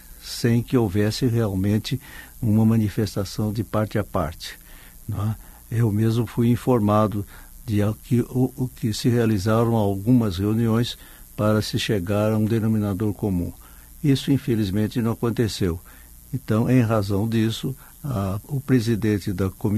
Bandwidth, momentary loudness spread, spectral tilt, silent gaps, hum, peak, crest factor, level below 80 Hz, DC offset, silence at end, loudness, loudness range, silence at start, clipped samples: 13.5 kHz; 12 LU; -7 dB/octave; none; none; -6 dBFS; 16 dB; -44 dBFS; under 0.1%; 0 s; -23 LUFS; 3 LU; 0.05 s; under 0.1%